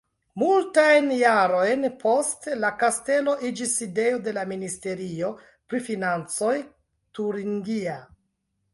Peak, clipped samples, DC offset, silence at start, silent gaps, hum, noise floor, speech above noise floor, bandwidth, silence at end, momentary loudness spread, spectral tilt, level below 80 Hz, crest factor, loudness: -6 dBFS; under 0.1%; under 0.1%; 0.35 s; none; none; -75 dBFS; 51 dB; 11.5 kHz; 0.7 s; 13 LU; -4 dB/octave; -68 dBFS; 18 dB; -24 LUFS